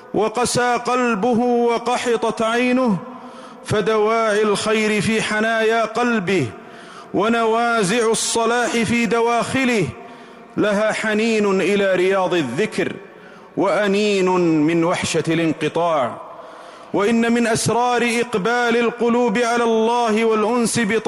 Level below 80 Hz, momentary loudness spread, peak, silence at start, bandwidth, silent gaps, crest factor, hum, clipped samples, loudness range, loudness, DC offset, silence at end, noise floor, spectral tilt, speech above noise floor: -56 dBFS; 9 LU; -10 dBFS; 0 s; 15.5 kHz; none; 10 dB; none; under 0.1%; 2 LU; -18 LUFS; under 0.1%; 0 s; -41 dBFS; -4.5 dB/octave; 24 dB